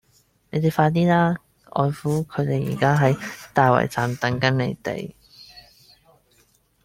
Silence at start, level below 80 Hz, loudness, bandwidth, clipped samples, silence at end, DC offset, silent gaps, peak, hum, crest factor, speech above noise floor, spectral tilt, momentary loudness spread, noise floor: 0.55 s; -56 dBFS; -22 LUFS; 16 kHz; under 0.1%; 1.25 s; under 0.1%; none; -2 dBFS; none; 20 dB; 41 dB; -7 dB/octave; 12 LU; -61 dBFS